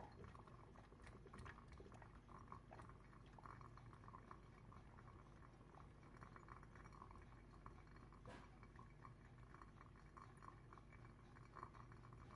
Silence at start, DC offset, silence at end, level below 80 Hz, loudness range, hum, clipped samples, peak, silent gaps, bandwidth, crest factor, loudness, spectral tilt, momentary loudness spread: 0 s; under 0.1%; 0 s; -68 dBFS; 2 LU; none; under 0.1%; -38 dBFS; none; 11 kHz; 24 dB; -63 LUFS; -6.5 dB/octave; 4 LU